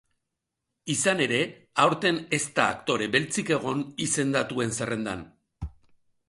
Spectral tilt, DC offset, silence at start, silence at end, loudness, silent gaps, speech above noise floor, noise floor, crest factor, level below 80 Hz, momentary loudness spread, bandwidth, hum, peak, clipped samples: -3.5 dB/octave; under 0.1%; 0.85 s; 0.6 s; -26 LUFS; none; 57 dB; -84 dBFS; 22 dB; -52 dBFS; 15 LU; 11.5 kHz; none; -6 dBFS; under 0.1%